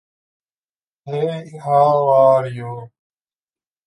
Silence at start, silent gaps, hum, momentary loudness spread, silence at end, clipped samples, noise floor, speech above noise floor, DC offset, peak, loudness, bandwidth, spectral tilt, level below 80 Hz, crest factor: 1.05 s; none; none; 17 LU; 1 s; under 0.1%; under -90 dBFS; over 74 dB; under 0.1%; -2 dBFS; -16 LUFS; 11 kHz; -8 dB/octave; -68 dBFS; 16 dB